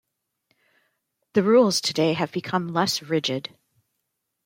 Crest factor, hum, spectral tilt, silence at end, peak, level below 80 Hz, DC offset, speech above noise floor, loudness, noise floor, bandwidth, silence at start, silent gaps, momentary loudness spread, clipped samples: 18 dB; none; -4.5 dB/octave; 1.05 s; -6 dBFS; -70 dBFS; under 0.1%; 57 dB; -23 LUFS; -79 dBFS; 16.5 kHz; 1.35 s; none; 10 LU; under 0.1%